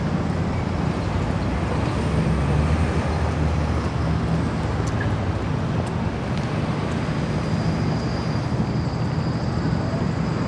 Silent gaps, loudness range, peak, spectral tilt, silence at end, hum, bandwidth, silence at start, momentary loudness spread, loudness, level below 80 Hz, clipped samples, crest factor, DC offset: none; 2 LU; -8 dBFS; -7.5 dB/octave; 0 s; none; 10.5 kHz; 0 s; 3 LU; -23 LUFS; -32 dBFS; under 0.1%; 14 dB; under 0.1%